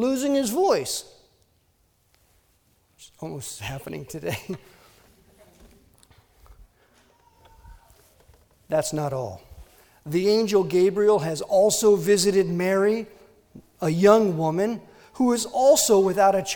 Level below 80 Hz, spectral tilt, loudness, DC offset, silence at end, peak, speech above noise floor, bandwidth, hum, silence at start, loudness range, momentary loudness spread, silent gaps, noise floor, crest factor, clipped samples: -58 dBFS; -4.5 dB/octave; -22 LUFS; under 0.1%; 0 s; -4 dBFS; 44 dB; over 20 kHz; none; 0 s; 16 LU; 18 LU; none; -65 dBFS; 20 dB; under 0.1%